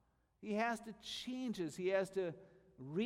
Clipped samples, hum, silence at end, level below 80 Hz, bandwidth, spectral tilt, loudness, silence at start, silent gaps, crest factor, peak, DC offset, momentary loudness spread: under 0.1%; none; 0 s; -76 dBFS; 15.5 kHz; -5 dB/octave; -41 LUFS; 0.4 s; none; 18 dB; -24 dBFS; under 0.1%; 13 LU